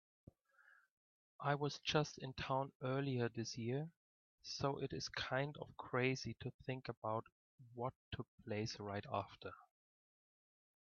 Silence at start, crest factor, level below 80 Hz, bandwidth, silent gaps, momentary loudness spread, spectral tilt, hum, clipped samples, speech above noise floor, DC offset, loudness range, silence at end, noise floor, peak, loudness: 1.4 s; 22 dB; -72 dBFS; 7.2 kHz; 2.75-2.80 s, 3.96-4.38 s, 6.54-6.59 s, 6.97-7.02 s, 7.32-7.58 s, 7.96-8.11 s, 8.28-8.38 s; 13 LU; -4.5 dB/octave; none; under 0.1%; 28 dB; under 0.1%; 6 LU; 1.35 s; -72 dBFS; -22 dBFS; -44 LUFS